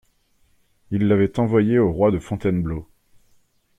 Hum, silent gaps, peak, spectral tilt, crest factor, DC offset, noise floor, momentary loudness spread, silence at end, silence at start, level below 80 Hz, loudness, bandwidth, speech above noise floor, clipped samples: none; none; -4 dBFS; -9 dB/octave; 18 dB; under 0.1%; -62 dBFS; 11 LU; 0.95 s; 0.9 s; -46 dBFS; -20 LUFS; 9.2 kHz; 43 dB; under 0.1%